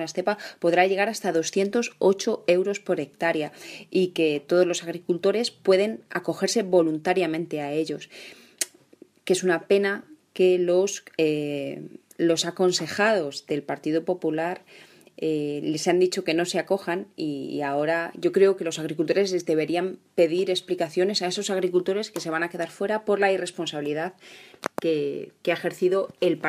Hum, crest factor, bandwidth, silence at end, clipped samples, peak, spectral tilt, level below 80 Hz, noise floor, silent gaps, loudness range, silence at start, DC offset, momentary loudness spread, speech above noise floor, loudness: none; 20 dB; 15 kHz; 0 s; under 0.1%; -6 dBFS; -4.5 dB/octave; -76 dBFS; -54 dBFS; none; 3 LU; 0 s; under 0.1%; 9 LU; 30 dB; -25 LUFS